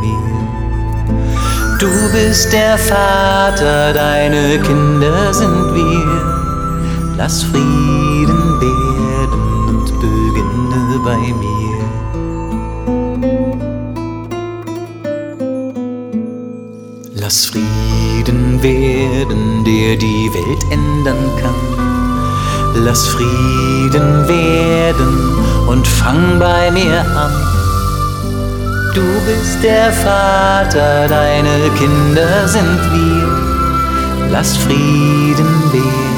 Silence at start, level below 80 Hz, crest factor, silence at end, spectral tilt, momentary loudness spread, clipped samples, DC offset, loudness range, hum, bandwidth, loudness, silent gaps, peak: 0 s; -22 dBFS; 12 dB; 0 s; -5.5 dB/octave; 10 LU; under 0.1%; under 0.1%; 7 LU; none; over 20 kHz; -13 LUFS; none; 0 dBFS